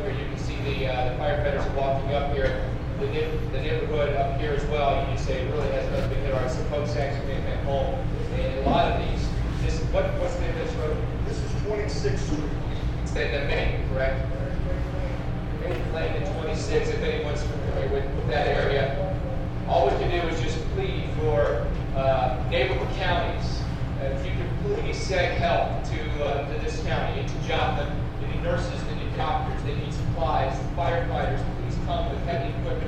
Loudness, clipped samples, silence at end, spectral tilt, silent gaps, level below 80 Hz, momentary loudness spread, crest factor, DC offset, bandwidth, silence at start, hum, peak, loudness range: -27 LUFS; under 0.1%; 0 s; -6.5 dB/octave; none; -30 dBFS; 6 LU; 16 dB; under 0.1%; 9.2 kHz; 0 s; none; -8 dBFS; 2 LU